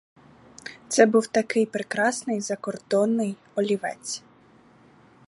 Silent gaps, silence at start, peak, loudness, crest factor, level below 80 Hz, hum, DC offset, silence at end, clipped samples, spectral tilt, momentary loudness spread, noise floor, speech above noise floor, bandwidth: none; 0.65 s; -2 dBFS; -24 LUFS; 24 dB; -72 dBFS; none; under 0.1%; 1.1 s; under 0.1%; -4 dB/octave; 15 LU; -55 dBFS; 31 dB; 11.5 kHz